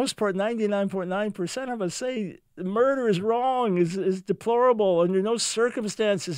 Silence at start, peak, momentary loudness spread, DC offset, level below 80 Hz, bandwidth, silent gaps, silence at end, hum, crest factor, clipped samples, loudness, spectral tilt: 0 s; -10 dBFS; 8 LU; under 0.1%; -68 dBFS; 16 kHz; none; 0 s; none; 14 dB; under 0.1%; -25 LUFS; -5 dB/octave